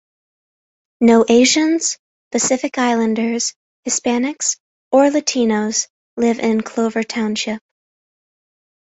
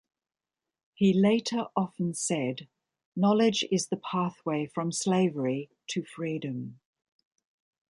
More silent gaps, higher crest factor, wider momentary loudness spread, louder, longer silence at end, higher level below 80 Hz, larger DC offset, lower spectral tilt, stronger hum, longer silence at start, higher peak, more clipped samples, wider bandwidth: first, 1.99-2.31 s, 3.56-3.83 s, 4.60-4.91 s, 5.90-6.17 s vs 3.05-3.12 s; about the same, 16 dB vs 18 dB; about the same, 11 LU vs 12 LU; first, -17 LUFS vs -28 LUFS; about the same, 1.25 s vs 1.15 s; first, -60 dBFS vs -74 dBFS; neither; second, -3 dB/octave vs -5 dB/octave; neither; about the same, 1 s vs 1 s; first, -2 dBFS vs -12 dBFS; neither; second, 8.2 kHz vs 11.5 kHz